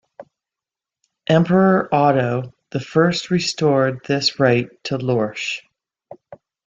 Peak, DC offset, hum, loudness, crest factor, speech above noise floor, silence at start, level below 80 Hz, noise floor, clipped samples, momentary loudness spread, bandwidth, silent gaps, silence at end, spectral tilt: -2 dBFS; under 0.1%; none; -18 LUFS; 18 dB; 70 dB; 0.2 s; -58 dBFS; -88 dBFS; under 0.1%; 11 LU; 8.4 kHz; none; 0.3 s; -5.5 dB/octave